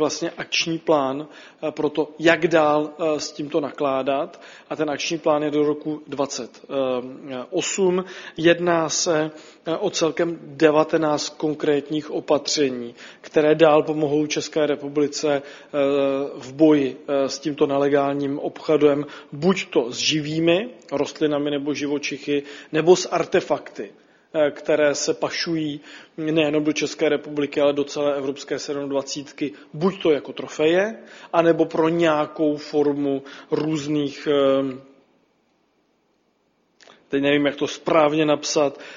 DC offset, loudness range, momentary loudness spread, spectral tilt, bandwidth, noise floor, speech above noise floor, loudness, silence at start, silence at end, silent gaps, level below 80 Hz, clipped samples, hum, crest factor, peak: under 0.1%; 4 LU; 11 LU; -4.5 dB/octave; 7.6 kHz; -66 dBFS; 45 dB; -22 LUFS; 0 s; 0 s; none; -66 dBFS; under 0.1%; none; 22 dB; 0 dBFS